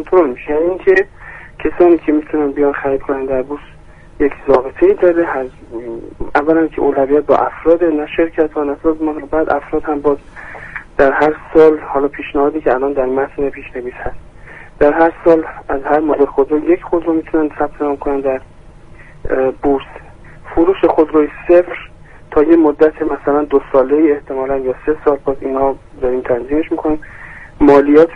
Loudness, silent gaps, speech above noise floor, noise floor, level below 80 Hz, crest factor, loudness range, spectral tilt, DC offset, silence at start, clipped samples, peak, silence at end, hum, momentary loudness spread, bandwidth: -14 LUFS; none; 23 dB; -37 dBFS; -36 dBFS; 14 dB; 4 LU; -8 dB/octave; under 0.1%; 0 s; under 0.1%; 0 dBFS; 0 s; none; 14 LU; 6 kHz